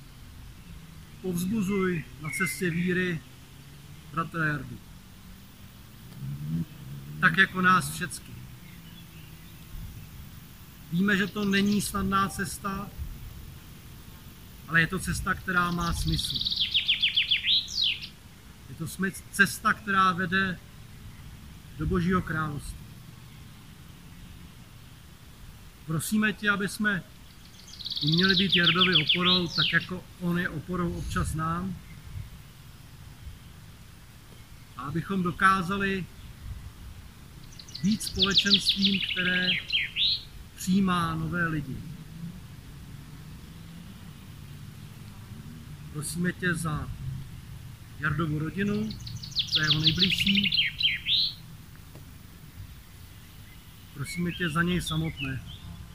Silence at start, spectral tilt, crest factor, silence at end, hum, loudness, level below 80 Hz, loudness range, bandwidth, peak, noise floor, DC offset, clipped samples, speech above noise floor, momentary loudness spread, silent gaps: 0 s; -4 dB/octave; 22 dB; 0 s; none; -26 LUFS; -48 dBFS; 12 LU; 16 kHz; -8 dBFS; -49 dBFS; 0.1%; under 0.1%; 22 dB; 25 LU; none